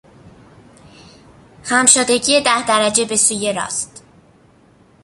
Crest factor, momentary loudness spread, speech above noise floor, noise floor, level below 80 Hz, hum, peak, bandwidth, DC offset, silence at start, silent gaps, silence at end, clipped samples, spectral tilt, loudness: 18 dB; 12 LU; 35 dB; -50 dBFS; -56 dBFS; none; 0 dBFS; 16 kHz; under 0.1%; 0.25 s; none; 1.2 s; under 0.1%; -1 dB/octave; -14 LUFS